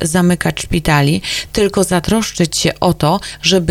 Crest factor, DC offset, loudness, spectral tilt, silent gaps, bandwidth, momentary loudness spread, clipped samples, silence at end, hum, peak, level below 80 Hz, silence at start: 14 dB; under 0.1%; -14 LUFS; -4.5 dB/octave; none; 16 kHz; 4 LU; under 0.1%; 0 s; none; 0 dBFS; -32 dBFS; 0 s